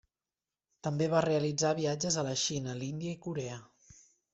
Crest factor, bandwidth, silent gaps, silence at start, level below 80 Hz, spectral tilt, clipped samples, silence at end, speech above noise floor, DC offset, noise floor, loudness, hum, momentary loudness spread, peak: 20 dB; 8.2 kHz; none; 0.85 s; -68 dBFS; -4.5 dB/octave; under 0.1%; 0.4 s; over 58 dB; under 0.1%; under -90 dBFS; -33 LUFS; none; 10 LU; -14 dBFS